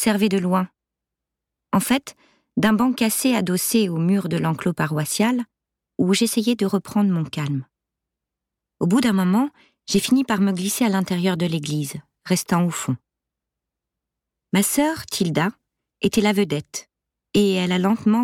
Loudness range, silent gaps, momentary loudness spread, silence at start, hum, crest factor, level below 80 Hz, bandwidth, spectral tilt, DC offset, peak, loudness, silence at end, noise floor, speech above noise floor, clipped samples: 4 LU; none; 9 LU; 0 s; none; 14 dB; -58 dBFS; 17 kHz; -5 dB/octave; under 0.1%; -8 dBFS; -21 LUFS; 0 s; -85 dBFS; 65 dB; under 0.1%